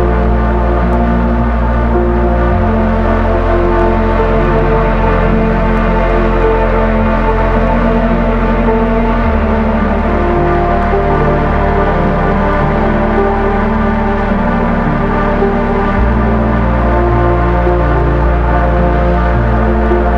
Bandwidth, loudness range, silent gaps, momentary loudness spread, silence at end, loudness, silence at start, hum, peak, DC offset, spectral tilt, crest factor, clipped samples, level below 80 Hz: 5.8 kHz; 1 LU; none; 1 LU; 0 s; -12 LUFS; 0 s; none; 0 dBFS; under 0.1%; -9.5 dB/octave; 10 dB; under 0.1%; -14 dBFS